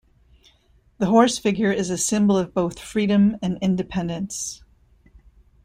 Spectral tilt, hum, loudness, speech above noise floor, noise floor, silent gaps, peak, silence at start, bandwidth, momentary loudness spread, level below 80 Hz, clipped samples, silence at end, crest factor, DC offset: -5 dB/octave; none; -21 LUFS; 38 dB; -58 dBFS; none; -4 dBFS; 1 s; 15 kHz; 11 LU; -52 dBFS; under 0.1%; 1.1 s; 18 dB; under 0.1%